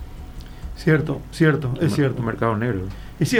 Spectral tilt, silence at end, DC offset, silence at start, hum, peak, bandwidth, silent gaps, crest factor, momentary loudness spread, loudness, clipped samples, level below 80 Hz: -6.5 dB/octave; 0 s; under 0.1%; 0 s; none; -4 dBFS; 15.5 kHz; none; 18 dB; 19 LU; -22 LUFS; under 0.1%; -38 dBFS